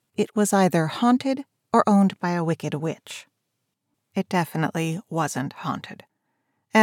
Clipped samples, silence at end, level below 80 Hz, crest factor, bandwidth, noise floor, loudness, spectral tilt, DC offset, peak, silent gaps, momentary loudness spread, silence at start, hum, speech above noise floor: under 0.1%; 0 s; -84 dBFS; 20 dB; 16.5 kHz; -78 dBFS; -24 LUFS; -5.5 dB/octave; under 0.1%; -4 dBFS; none; 12 LU; 0.2 s; none; 55 dB